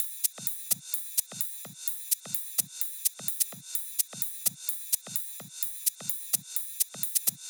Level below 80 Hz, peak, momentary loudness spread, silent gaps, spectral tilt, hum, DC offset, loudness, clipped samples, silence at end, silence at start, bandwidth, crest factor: under -90 dBFS; -8 dBFS; 4 LU; none; 0.5 dB/octave; none; under 0.1%; -30 LUFS; under 0.1%; 0 s; 0 s; over 20 kHz; 24 dB